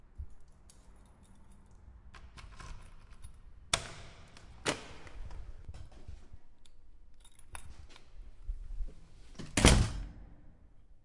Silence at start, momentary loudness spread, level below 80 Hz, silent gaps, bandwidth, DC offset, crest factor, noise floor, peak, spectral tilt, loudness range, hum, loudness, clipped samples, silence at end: 0.05 s; 27 LU; -42 dBFS; none; 11.5 kHz; under 0.1%; 34 dB; -57 dBFS; -4 dBFS; -3.5 dB/octave; 21 LU; none; -32 LUFS; under 0.1%; 0.05 s